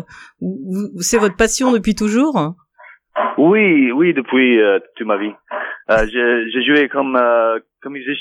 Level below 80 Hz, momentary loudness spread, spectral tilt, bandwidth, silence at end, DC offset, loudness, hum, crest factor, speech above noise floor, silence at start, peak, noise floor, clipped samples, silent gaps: -40 dBFS; 13 LU; -4 dB/octave; 16 kHz; 0 s; under 0.1%; -15 LUFS; none; 16 dB; 29 dB; 0.1 s; 0 dBFS; -45 dBFS; under 0.1%; none